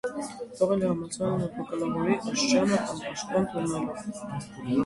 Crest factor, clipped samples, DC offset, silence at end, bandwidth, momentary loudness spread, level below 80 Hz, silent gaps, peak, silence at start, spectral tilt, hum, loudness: 18 dB; under 0.1%; under 0.1%; 0 s; 11.5 kHz; 12 LU; -60 dBFS; none; -10 dBFS; 0.05 s; -5 dB/octave; none; -28 LUFS